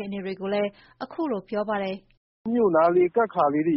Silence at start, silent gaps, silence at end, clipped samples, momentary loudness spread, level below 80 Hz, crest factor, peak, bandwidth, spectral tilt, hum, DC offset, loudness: 0 s; 2.17-2.45 s; 0 s; under 0.1%; 16 LU; -64 dBFS; 14 dB; -10 dBFS; 5.8 kHz; -5.5 dB/octave; none; under 0.1%; -24 LUFS